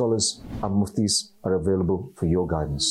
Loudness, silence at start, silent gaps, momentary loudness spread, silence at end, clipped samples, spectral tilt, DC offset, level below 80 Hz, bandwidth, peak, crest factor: -24 LUFS; 0 s; none; 4 LU; 0 s; under 0.1%; -5 dB/octave; under 0.1%; -44 dBFS; 13 kHz; -12 dBFS; 12 dB